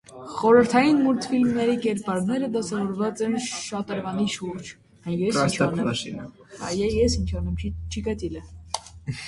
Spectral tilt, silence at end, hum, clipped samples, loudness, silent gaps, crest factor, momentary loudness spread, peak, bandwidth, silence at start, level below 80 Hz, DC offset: -5.5 dB/octave; 0 s; none; under 0.1%; -24 LUFS; none; 20 dB; 16 LU; -4 dBFS; 11.5 kHz; 0.1 s; -40 dBFS; under 0.1%